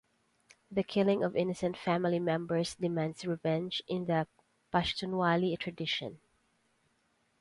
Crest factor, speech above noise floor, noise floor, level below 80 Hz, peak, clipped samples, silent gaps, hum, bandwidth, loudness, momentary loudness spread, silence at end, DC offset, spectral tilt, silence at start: 20 dB; 42 dB; -74 dBFS; -64 dBFS; -14 dBFS; under 0.1%; none; none; 11.5 kHz; -33 LUFS; 6 LU; 1.25 s; under 0.1%; -6 dB/octave; 0.7 s